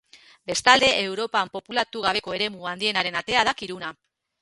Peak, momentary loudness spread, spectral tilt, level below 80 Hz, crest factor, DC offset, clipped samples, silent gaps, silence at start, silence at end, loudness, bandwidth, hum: 0 dBFS; 15 LU; -2 dB/octave; -58 dBFS; 24 dB; under 0.1%; under 0.1%; none; 0.5 s; 0.5 s; -22 LUFS; 11.5 kHz; none